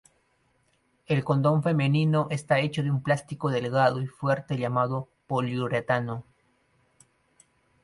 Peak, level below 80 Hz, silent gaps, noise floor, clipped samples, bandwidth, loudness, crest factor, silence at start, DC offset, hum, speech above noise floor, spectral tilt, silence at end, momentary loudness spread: -8 dBFS; -64 dBFS; none; -69 dBFS; under 0.1%; 11.5 kHz; -26 LUFS; 18 dB; 1.1 s; under 0.1%; none; 43 dB; -7 dB/octave; 1.6 s; 6 LU